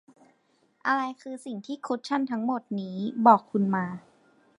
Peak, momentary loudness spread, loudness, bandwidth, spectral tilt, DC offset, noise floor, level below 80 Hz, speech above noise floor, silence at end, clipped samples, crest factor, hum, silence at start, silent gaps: -6 dBFS; 17 LU; -27 LUFS; 11 kHz; -7 dB/octave; under 0.1%; -68 dBFS; -76 dBFS; 41 dB; 0.6 s; under 0.1%; 22 dB; none; 0.85 s; none